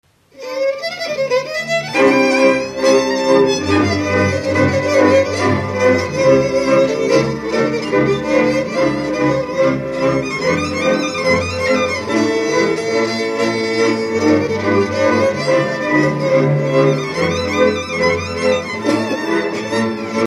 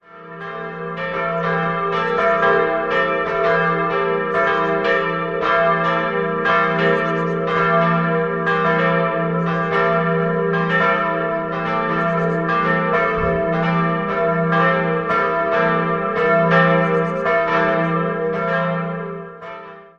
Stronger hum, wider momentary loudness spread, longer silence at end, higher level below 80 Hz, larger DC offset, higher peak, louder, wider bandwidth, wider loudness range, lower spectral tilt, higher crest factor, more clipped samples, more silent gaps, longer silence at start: neither; about the same, 5 LU vs 6 LU; about the same, 0 s vs 0.1 s; about the same, -48 dBFS vs -48 dBFS; neither; about the same, 0 dBFS vs 0 dBFS; first, -15 LUFS vs -18 LUFS; first, 13.5 kHz vs 6.8 kHz; about the same, 2 LU vs 2 LU; second, -5.5 dB/octave vs -7.5 dB/octave; about the same, 16 dB vs 18 dB; neither; neither; first, 0.35 s vs 0.15 s